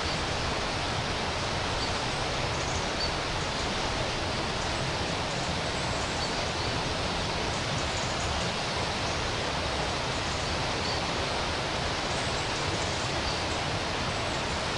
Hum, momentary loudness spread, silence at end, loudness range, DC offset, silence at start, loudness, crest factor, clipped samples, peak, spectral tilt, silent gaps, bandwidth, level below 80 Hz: none; 1 LU; 0 s; 0 LU; under 0.1%; 0 s; -29 LUFS; 14 dB; under 0.1%; -16 dBFS; -3.5 dB/octave; none; 11.5 kHz; -42 dBFS